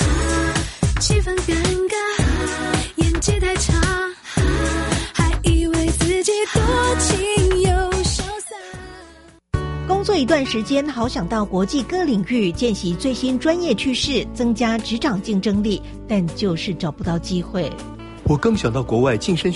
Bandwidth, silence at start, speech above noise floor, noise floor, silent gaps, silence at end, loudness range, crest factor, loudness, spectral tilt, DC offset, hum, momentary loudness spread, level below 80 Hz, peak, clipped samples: 11.5 kHz; 0 s; 26 dB; -45 dBFS; none; 0 s; 4 LU; 16 dB; -20 LUFS; -5 dB/octave; under 0.1%; none; 7 LU; -28 dBFS; -4 dBFS; under 0.1%